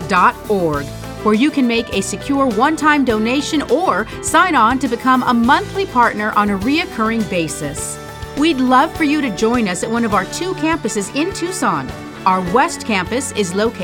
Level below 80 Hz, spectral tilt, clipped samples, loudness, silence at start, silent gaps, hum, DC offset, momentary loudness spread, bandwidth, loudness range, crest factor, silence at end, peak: -40 dBFS; -4 dB/octave; under 0.1%; -16 LUFS; 0 s; none; none; under 0.1%; 7 LU; 18.5 kHz; 3 LU; 16 dB; 0 s; 0 dBFS